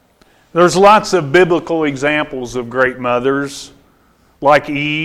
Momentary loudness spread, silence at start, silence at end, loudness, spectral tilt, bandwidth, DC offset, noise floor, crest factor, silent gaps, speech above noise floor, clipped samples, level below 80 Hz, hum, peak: 12 LU; 0.55 s; 0 s; -13 LUFS; -5 dB/octave; 13.5 kHz; under 0.1%; -52 dBFS; 14 dB; none; 39 dB; under 0.1%; -46 dBFS; none; 0 dBFS